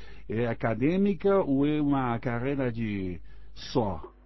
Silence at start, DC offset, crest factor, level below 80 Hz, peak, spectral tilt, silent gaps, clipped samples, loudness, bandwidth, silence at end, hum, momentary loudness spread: 0 s; 1%; 16 dB; -48 dBFS; -12 dBFS; -8.5 dB/octave; none; under 0.1%; -28 LUFS; 6 kHz; 0 s; none; 10 LU